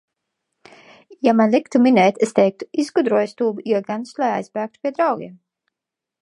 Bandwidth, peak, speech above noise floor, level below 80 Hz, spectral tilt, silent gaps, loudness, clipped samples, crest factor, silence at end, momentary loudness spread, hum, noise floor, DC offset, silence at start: 11.5 kHz; -2 dBFS; 67 dB; -74 dBFS; -6 dB/octave; none; -19 LUFS; under 0.1%; 18 dB; 0.85 s; 11 LU; none; -85 dBFS; under 0.1%; 1.1 s